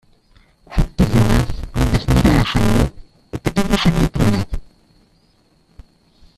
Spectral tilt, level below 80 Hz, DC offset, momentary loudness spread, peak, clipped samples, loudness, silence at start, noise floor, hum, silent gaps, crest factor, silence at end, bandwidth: -6.5 dB/octave; -24 dBFS; under 0.1%; 11 LU; -2 dBFS; under 0.1%; -17 LUFS; 0.7 s; -57 dBFS; none; none; 16 dB; 1.75 s; 14.5 kHz